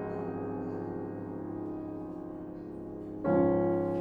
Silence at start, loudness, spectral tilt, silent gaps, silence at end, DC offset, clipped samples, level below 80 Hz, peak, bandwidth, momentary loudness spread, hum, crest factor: 0 s; -34 LUFS; -11 dB/octave; none; 0 s; under 0.1%; under 0.1%; -58 dBFS; -14 dBFS; 4.5 kHz; 15 LU; none; 18 dB